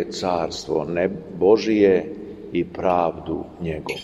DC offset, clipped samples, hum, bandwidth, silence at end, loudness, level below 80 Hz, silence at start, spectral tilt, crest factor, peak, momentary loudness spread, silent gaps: under 0.1%; under 0.1%; none; 12 kHz; 0 s; -22 LUFS; -50 dBFS; 0 s; -6 dB/octave; 18 dB; -4 dBFS; 13 LU; none